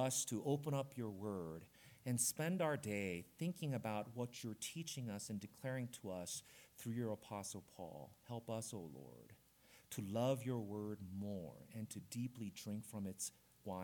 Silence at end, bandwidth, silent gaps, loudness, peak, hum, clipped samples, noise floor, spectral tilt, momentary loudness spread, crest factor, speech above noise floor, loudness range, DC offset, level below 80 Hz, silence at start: 0 s; 19 kHz; none; -45 LUFS; -26 dBFS; none; under 0.1%; -69 dBFS; -4.5 dB/octave; 13 LU; 20 dB; 24 dB; 6 LU; under 0.1%; -80 dBFS; 0 s